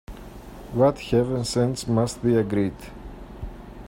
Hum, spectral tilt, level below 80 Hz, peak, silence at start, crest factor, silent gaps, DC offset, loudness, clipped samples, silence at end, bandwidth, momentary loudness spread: none; -6.5 dB/octave; -42 dBFS; -6 dBFS; 0.1 s; 18 dB; none; under 0.1%; -23 LUFS; under 0.1%; 0 s; 16 kHz; 20 LU